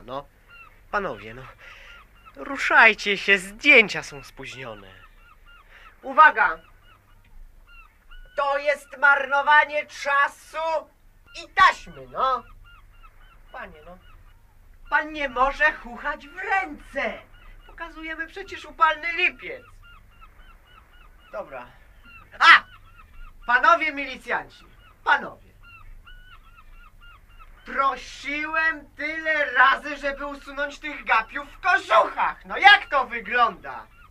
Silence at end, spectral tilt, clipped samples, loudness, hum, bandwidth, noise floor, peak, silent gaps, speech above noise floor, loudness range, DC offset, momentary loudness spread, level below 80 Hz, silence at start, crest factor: 0.25 s; -2.5 dB/octave; under 0.1%; -21 LUFS; none; 15.5 kHz; -53 dBFS; 0 dBFS; none; 31 dB; 10 LU; under 0.1%; 23 LU; -50 dBFS; 0.1 s; 24 dB